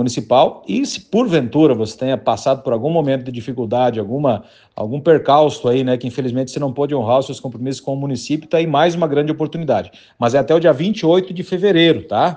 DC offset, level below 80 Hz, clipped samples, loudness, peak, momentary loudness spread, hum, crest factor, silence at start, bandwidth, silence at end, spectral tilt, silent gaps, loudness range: under 0.1%; -58 dBFS; under 0.1%; -17 LUFS; 0 dBFS; 9 LU; none; 16 dB; 0 s; 9.6 kHz; 0 s; -6 dB/octave; none; 3 LU